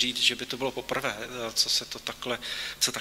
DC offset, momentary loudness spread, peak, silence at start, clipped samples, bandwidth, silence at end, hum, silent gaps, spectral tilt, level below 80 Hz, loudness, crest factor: under 0.1%; 9 LU; -8 dBFS; 0 s; under 0.1%; 16 kHz; 0 s; none; none; -1 dB/octave; -60 dBFS; -28 LUFS; 22 dB